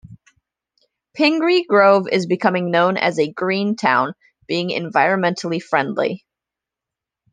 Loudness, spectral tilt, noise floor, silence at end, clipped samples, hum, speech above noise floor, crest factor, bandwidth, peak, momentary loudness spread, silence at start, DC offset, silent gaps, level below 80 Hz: -18 LUFS; -5.5 dB/octave; -86 dBFS; 1.15 s; under 0.1%; none; 69 dB; 18 dB; 9.6 kHz; -2 dBFS; 10 LU; 0.1 s; under 0.1%; none; -66 dBFS